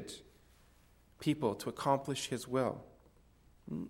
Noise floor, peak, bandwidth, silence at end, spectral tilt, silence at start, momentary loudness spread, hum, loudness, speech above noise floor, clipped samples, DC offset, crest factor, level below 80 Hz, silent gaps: -65 dBFS; -16 dBFS; 16.5 kHz; 0 s; -5 dB/octave; 0 s; 15 LU; none; -36 LUFS; 30 dB; under 0.1%; under 0.1%; 22 dB; -66 dBFS; none